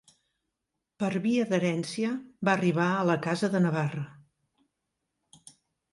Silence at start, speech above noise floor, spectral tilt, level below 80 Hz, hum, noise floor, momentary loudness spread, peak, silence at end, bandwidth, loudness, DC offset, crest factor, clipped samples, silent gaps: 1 s; 57 dB; -6.5 dB/octave; -72 dBFS; none; -85 dBFS; 7 LU; -10 dBFS; 1.8 s; 11.5 kHz; -28 LUFS; under 0.1%; 20 dB; under 0.1%; none